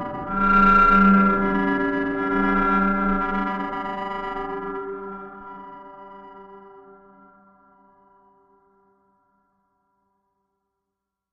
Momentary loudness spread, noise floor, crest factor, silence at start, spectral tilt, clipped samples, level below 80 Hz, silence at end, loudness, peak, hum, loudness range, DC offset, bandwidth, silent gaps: 26 LU; -83 dBFS; 18 dB; 0 s; -8.5 dB/octave; under 0.1%; -40 dBFS; 4.5 s; -20 LUFS; -6 dBFS; none; 23 LU; under 0.1%; 5.6 kHz; none